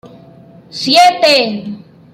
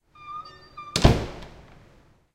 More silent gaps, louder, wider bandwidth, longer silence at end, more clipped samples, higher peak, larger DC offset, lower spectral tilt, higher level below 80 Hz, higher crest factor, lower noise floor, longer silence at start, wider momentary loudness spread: neither; first, -10 LUFS vs -23 LUFS; about the same, 15.5 kHz vs 16 kHz; second, 0.35 s vs 0.85 s; neither; about the same, 0 dBFS vs 0 dBFS; neither; second, -3 dB/octave vs -5.5 dB/octave; second, -62 dBFS vs -34 dBFS; second, 14 dB vs 28 dB; second, -39 dBFS vs -56 dBFS; second, 0.05 s vs 0.2 s; about the same, 21 LU vs 23 LU